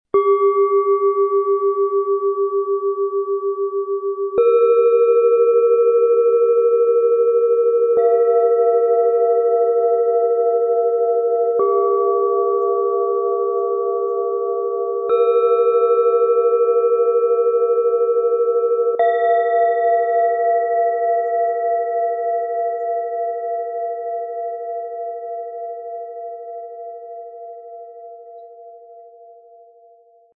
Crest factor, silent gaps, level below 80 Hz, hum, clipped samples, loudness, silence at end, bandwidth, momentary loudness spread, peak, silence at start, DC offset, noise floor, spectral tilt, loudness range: 12 dB; none; -74 dBFS; none; under 0.1%; -17 LUFS; 1.25 s; 3.9 kHz; 14 LU; -6 dBFS; 0.15 s; under 0.1%; -51 dBFS; -8.5 dB/octave; 14 LU